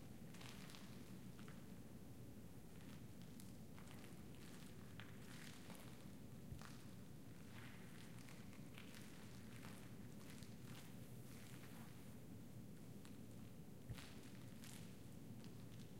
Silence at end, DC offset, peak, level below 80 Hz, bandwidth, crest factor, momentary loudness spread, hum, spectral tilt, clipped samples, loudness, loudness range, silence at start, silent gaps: 0 s; under 0.1%; -36 dBFS; -72 dBFS; 16 kHz; 20 dB; 2 LU; none; -5 dB/octave; under 0.1%; -59 LUFS; 1 LU; 0 s; none